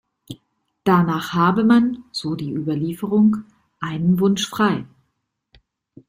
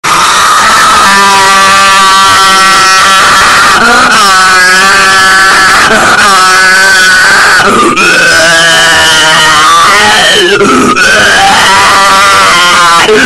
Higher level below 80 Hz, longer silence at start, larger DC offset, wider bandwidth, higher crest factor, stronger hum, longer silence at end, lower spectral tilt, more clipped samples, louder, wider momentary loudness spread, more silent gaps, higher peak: second, -58 dBFS vs -32 dBFS; first, 0.3 s vs 0.05 s; neither; second, 15.5 kHz vs over 20 kHz; first, 16 dB vs 4 dB; neither; first, 1.25 s vs 0 s; first, -6.5 dB/octave vs -1 dB/octave; second, under 0.1% vs 2%; second, -20 LUFS vs -2 LUFS; first, 14 LU vs 1 LU; neither; second, -4 dBFS vs 0 dBFS